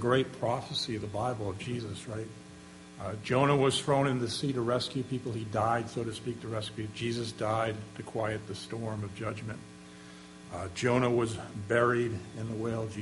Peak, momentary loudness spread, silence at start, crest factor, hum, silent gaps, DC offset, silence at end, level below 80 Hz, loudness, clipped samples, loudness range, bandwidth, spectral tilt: -12 dBFS; 16 LU; 0 s; 20 dB; none; none; under 0.1%; 0 s; -60 dBFS; -32 LUFS; under 0.1%; 6 LU; 11.5 kHz; -5.5 dB/octave